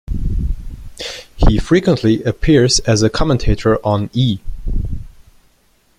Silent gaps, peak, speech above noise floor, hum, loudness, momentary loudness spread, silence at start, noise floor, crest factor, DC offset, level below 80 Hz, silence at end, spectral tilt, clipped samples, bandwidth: none; 0 dBFS; 42 dB; none; -16 LUFS; 15 LU; 0.1 s; -56 dBFS; 16 dB; under 0.1%; -22 dBFS; 0.9 s; -5.5 dB/octave; under 0.1%; 11.5 kHz